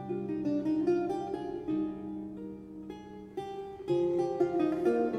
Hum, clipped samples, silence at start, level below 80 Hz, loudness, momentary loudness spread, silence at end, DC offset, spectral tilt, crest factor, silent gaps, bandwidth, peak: none; under 0.1%; 0 s; -64 dBFS; -32 LUFS; 15 LU; 0 s; under 0.1%; -8 dB/octave; 16 dB; none; 9.2 kHz; -16 dBFS